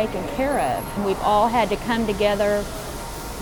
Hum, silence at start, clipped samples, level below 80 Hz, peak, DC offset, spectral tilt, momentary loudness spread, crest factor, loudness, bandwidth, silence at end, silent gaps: none; 0 s; under 0.1%; -38 dBFS; -8 dBFS; under 0.1%; -5 dB/octave; 13 LU; 14 dB; -22 LUFS; over 20 kHz; 0 s; none